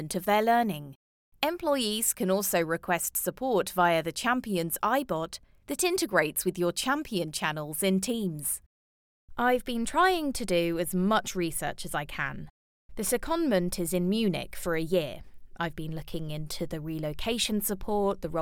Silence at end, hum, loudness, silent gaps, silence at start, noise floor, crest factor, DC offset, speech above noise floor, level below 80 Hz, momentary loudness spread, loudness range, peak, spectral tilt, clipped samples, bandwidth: 0 s; none; -29 LUFS; 0.95-1.32 s, 8.66-9.28 s, 12.50-12.89 s; 0 s; under -90 dBFS; 20 dB; under 0.1%; over 61 dB; -50 dBFS; 10 LU; 4 LU; -10 dBFS; -4 dB/octave; under 0.1%; over 20 kHz